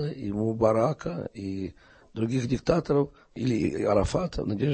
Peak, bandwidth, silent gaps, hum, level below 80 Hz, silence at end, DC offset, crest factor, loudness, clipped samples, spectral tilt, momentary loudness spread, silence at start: -8 dBFS; 8.8 kHz; none; none; -44 dBFS; 0 s; under 0.1%; 20 dB; -27 LUFS; under 0.1%; -7.5 dB/octave; 11 LU; 0 s